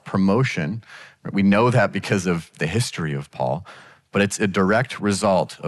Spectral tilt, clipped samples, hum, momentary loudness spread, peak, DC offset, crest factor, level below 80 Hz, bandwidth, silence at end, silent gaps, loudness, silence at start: -5.5 dB/octave; under 0.1%; none; 10 LU; -8 dBFS; under 0.1%; 14 dB; -54 dBFS; 12 kHz; 0 s; none; -21 LUFS; 0.05 s